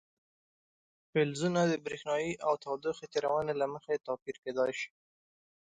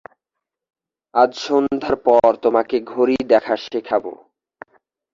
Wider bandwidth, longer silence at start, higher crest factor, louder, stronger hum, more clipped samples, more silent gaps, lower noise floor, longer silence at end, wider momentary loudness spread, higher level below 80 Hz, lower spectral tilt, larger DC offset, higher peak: first, 9.4 kHz vs 7.6 kHz; about the same, 1.15 s vs 1.15 s; about the same, 18 dB vs 18 dB; second, -34 LUFS vs -18 LUFS; neither; neither; first, 4.22-4.26 s, 4.38-4.43 s vs none; first, under -90 dBFS vs -83 dBFS; second, 0.8 s vs 1 s; about the same, 8 LU vs 9 LU; second, -72 dBFS vs -56 dBFS; about the same, -5.5 dB/octave vs -5.5 dB/octave; neither; second, -16 dBFS vs -2 dBFS